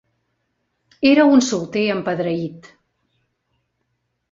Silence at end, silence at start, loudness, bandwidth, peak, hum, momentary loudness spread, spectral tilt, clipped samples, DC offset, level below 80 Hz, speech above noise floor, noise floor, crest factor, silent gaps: 1.7 s; 1 s; -17 LUFS; 7.6 kHz; -2 dBFS; none; 12 LU; -5 dB/octave; under 0.1%; under 0.1%; -62 dBFS; 56 dB; -72 dBFS; 18 dB; none